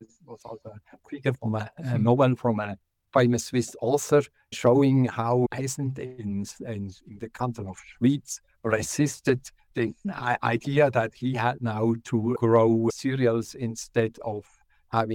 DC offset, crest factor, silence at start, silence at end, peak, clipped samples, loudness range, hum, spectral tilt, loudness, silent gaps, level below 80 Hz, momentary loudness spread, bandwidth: under 0.1%; 18 dB; 0 s; 0 s; -8 dBFS; under 0.1%; 5 LU; none; -6.5 dB/octave; -26 LUFS; none; -62 dBFS; 15 LU; 17.5 kHz